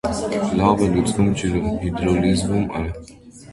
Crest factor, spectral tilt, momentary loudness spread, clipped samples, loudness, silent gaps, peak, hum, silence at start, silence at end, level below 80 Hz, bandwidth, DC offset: 20 dB; -6.5 dB/octave; 8 LU; under 0.1%; -20 LUFS; none; 0 dBFS; none; 0.05 s; 0 s; -36 dBFS; 11.5 kHz; under 0.1%